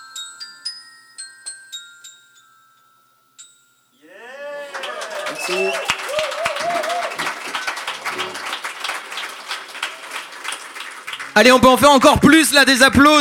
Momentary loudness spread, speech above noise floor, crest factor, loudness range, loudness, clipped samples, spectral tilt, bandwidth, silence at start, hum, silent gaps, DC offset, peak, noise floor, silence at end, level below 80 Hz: 22 LU; 46 dB; 18 dB; 23 LU; -16 LUFS; under 0.1%; -3 dB/octave; 18 kHz; 0 s; 50 Hz at -75 dBFS; none; under 0.1%; 0 dBFS; -57 dBFS; 0 s; -44 dBFS